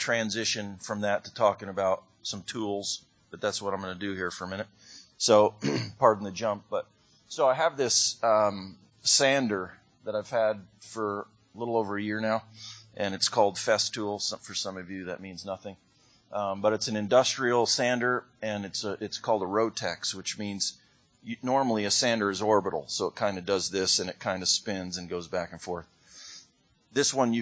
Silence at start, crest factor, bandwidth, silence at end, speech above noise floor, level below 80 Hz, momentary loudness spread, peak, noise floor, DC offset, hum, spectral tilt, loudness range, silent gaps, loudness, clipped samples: 0 s; 24 dB; 8 kHz; 0 s; 36 dB; -64 dBFS; 15 LU; -6 dBFS; -64 dBFS; under 0.1%; none; -3 dB/octave; 6 LU; none; -28 LUFS; under 0.1%